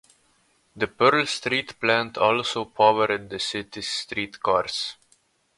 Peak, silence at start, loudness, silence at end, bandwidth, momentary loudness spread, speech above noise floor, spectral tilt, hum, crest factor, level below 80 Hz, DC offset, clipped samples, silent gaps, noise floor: -4 dBFS; 0.75 s; -23 LUFS; 0.65 s; 11.5 kHz; 11 LU; 41 dB; -3.5 dB/octave; none; 20 dB; -62 dBFS; under 0.1%; under 0.1%; none; -65 dBFS